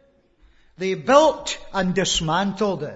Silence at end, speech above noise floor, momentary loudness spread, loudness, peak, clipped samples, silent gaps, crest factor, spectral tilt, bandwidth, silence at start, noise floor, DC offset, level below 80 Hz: 0 s; 36 dB; 11 LU; -20 LUFS; 0 dBFS; under 0.1%; none; 22 dB; -4 dB/octave; 8 kHz; 0.8 s; -56 dBFS; under 0.1%; -46 dBFS